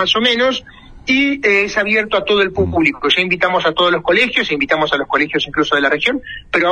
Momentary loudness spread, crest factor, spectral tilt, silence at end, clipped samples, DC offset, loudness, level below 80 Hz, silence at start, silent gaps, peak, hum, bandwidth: 4 LU; 16 dB; -4.5 dB/octave; 0 s; under 0.1%; under 0.1%; -14 LUFS; -44 dBFS; 0 s; none; 0 dBFS; none; 10 kHz